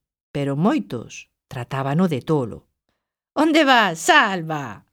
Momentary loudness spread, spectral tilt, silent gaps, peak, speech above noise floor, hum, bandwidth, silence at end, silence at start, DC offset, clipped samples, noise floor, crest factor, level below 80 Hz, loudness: 17 LU; -5 dB/octave; none; 0 dBFS; 56 dB; none; 17.5 kHz; 0.15 s; 0.35 s; under 0.1%; under 0.1%; -76 dBFS; 20 dB; -60 dBFS; -19 LUFS